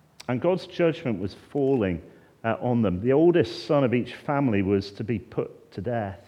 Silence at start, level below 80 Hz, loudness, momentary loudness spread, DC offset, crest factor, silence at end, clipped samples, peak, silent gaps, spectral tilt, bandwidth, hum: 0.3 s; -60 dBFS; -25 LUFS; 12 LU; under 0.1%; 16 dB; 0.1 s; under 0.1%; -8 dBFS; none; -8 dB/octave; 10.5 kHz; none